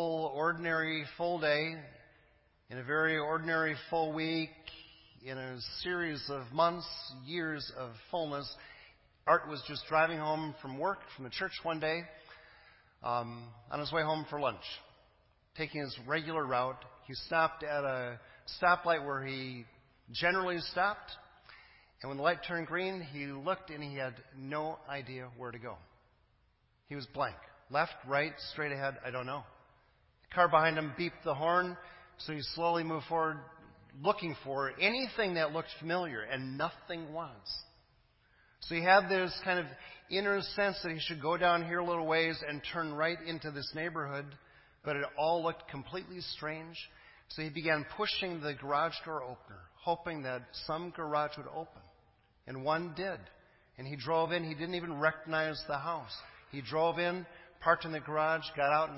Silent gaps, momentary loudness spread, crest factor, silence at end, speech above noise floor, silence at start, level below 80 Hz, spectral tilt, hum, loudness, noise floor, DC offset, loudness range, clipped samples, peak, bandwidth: none; 15 LU; 24 dB; 0 s; 37 dB; 0 s; -66 dBFS; -8.5 dB/octave; none; -35 LUFS; -72 dBFS; under 0.1%; 6 LU; under 0.1%; -12 dBFS; 5.8 kHz